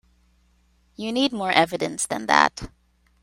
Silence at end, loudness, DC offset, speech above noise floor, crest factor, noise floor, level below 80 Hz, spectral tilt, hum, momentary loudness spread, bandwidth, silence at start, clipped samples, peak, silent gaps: 0.55 s; -22 LUFS; under 0.1%; 40 dB; 24 dB; -62 dBFS; -52 dBFS; -3 dB/octave; none; 15 LU; 16 kHz; 1 s; under 0.1%; 0 dBFS; none